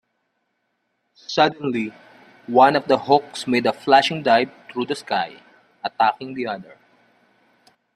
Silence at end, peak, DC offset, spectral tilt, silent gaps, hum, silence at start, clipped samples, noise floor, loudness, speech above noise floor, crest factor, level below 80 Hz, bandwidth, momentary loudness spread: 1.35 s; -2 dBFS; under 0.1%; -4.5 dB/octave; none; none; 1.3 s; under 0.1%; -72 dBFS; -20 LUFS; 53 dB; 20 dB; -68 dBFS; 13 kHz; 15 LU